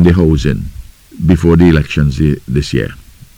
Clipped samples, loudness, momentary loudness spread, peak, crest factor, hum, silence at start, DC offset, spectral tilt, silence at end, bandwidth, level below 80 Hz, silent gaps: under 0.1%; -12 LUFS; 11 LU; 0 dBFS; 12 dB; none; 0 s; under 0.1%; -7.5 dB/octave; 0.4 s; 12.5 kHz; -22 dBFS; none